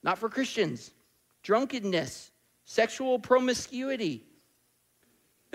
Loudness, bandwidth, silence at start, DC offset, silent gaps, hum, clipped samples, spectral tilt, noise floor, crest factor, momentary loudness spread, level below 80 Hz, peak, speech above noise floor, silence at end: -29 LUFS; 16 kHz; 0.05 s; under 0.1%; none; none; under 0.1%; -4 dB/octave; -71 dBFS; 22 dB; 16 LU; -70 dBFS; -10 dBFS; 42 dB; 1.35 s